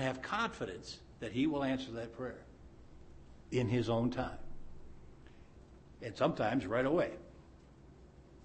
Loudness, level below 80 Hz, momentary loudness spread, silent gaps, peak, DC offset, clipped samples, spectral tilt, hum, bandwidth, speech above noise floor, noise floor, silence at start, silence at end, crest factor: -36 LUFS; -56 dBFS; 24 LU; none; -18 dBFS; under 0.1%; under 0.1%; -6.5 dB/octave; none; 8.4 kHz; 22 dB; -58 dBFS; 0 s; 0 s; 20 dB